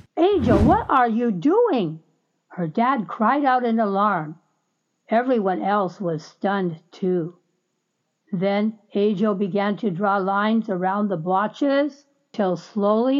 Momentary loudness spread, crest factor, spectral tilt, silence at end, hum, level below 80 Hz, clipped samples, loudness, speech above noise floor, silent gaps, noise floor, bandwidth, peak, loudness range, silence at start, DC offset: 10 LU; 16 dB; -8 dB/octave; 0 s; none; -44 dBFS; under 0.1%; -22 LUFS; 54 dB; none; -74 dBFS; 7.2 kHz; -6 dBFS; 5 LU; 0.15 s; under 0.1%